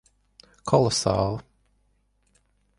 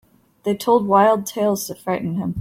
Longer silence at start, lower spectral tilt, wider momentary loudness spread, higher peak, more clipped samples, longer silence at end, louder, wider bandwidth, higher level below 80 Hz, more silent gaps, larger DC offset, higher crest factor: first, 0.65 s vs 0.45 s; about the same, -5 dB/octave vs -5.5 dB/octave; first, 16 LU vs 10 LU; about the same, -6 dBFS vs -4 dBFS; neither; first, 1.35 s vs 0 s; second, -23 LUFS vs -19 LUFS; second, 11.5 kHz vs 16.5 kHz; first, -50 dBFS vs -58 dBFS; neither; neither; first, 22 dB vs 16 dB